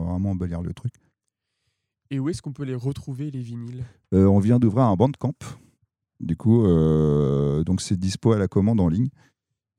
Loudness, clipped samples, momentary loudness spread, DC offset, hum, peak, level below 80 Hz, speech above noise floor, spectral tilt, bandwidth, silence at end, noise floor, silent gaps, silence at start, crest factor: -22 LUFS; under 0.1%; 16 LU; under 0.1%; none; -4 dBFS; -44 dBFS; 58 dB; -8 dB/octave; 11 kHz; 0.7 s; -80 dBFS; none; 0 s; 18 dB